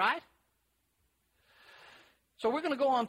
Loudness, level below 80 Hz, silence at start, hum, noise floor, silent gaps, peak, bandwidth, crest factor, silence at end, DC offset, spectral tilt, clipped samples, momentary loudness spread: -33 LUFS; -78 dBFS; 0 s; none; -77 dBFS; none; -16 dBFS; 15.5 kHz; 20 dB; 0 s; under 0.1%; -4.5 dB/octave; under 0.1%; 25 LU